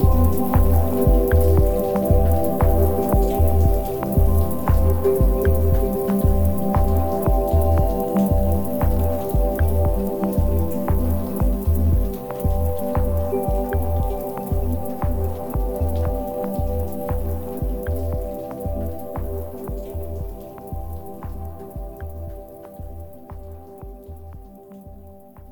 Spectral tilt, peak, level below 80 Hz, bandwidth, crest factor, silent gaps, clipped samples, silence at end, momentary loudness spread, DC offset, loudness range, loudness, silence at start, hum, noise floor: -8.5 dB/octave; -6 dBFS; -24 dBFS; 19.5 kHz; 14 dB; none; under 0.1%; 0 s; 18 LU; 3%; 16 LU; -21 LUFS; 0 s; none; -43 dBFS